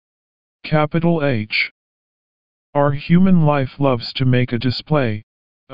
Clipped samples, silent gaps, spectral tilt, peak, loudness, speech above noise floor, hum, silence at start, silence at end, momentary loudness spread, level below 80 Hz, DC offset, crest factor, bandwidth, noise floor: under 0.1%; 1.71-2.73 s, 5.23-5.67 s; -6 dB/octave; -2 dBFS; -18 LUFS; over 74 dB; none; 0.6 s; 0 s; 9 LU; -46 dBFS; 3%; 16 dB; 5.4 kHz; under -90 dBFS